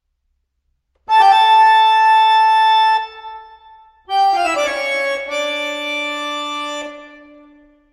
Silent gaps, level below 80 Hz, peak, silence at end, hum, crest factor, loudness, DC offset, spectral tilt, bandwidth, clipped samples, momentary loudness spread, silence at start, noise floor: none; -60 dBFS; -2 dBFS; 0.85 s; none; 14 dB; -14 LUFS; under 0.1%; 0 dB/octave; 12.5 kHz; under 0.1%; 15 LU; 1.1 s; -68 dBFS